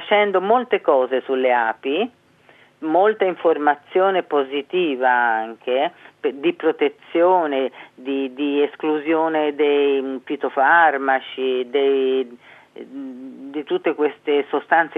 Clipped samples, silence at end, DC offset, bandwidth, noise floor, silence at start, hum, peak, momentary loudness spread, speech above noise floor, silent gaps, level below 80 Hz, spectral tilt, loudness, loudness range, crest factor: under 0.1%; 0 s; under 0.1%; 4 kHz; -52 dBFS; 0 s; none; -2 dBFS; 10 LU; 33 dB; none; -84 dBFS; -7 dB/octave; -19 LUFS; 3 LU; 18 dB